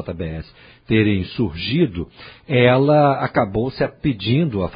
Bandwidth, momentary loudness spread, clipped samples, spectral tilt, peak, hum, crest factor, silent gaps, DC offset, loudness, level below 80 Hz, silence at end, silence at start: 5.2 kHz; 14 LU; under 0.1%; -12 dB/octave; -2 dBFS; none; 18 dB; none; under 0.1%; -18 LUFS; -40 dBFS; 0.05 s; 0 s